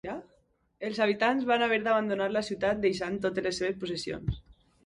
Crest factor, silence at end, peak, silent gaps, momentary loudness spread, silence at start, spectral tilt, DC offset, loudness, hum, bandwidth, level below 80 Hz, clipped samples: 18 dB; 0.45 s; -12 dBFS; none; 11 LU; 0.05 s; -5 dB/octave; under 0.1%; -29 LUFS; none; 11.5 kHz; -52 dBFS; under 0.1%